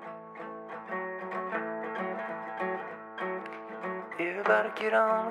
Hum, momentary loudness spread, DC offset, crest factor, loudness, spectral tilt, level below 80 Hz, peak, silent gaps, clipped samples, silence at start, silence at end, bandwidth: none; 15 LU; under 0.1%; 20 dB; -32 LUFS; -6 dB/octave; -90 dBFS; -12 dBFS; none; under 0.1%; 0 s; 0 s; 11 kHz